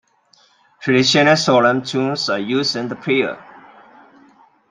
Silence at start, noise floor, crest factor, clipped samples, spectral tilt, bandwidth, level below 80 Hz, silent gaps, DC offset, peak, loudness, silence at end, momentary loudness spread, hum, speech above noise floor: 0.8 s; -56 dBFS; 18 dB; under 0.1%; -4.5 dB/octave; 9.6 kHz; -62 dBFS; none; under 0.1%; -2 dBFS; -16 LUFS; 1.3 s; 11 LU; none; 39 dB